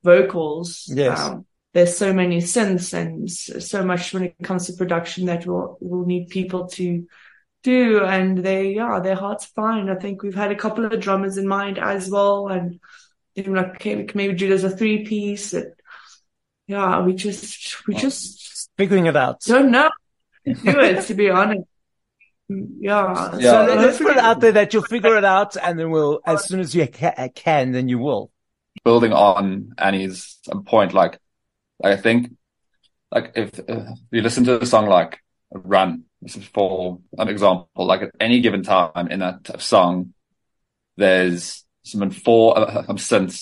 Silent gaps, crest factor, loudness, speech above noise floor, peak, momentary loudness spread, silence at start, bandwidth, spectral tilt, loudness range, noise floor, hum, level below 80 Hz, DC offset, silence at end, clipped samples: none; 18 dB; -19 LUFS; 58 dB; -2 dBFS; 14 LU; 0.05 s; 11.5 kHz; -5 dB/octave; 7 LU; -77 dBFS; none; -62 dBFS; under 0.1%; 0 s; under 0.1%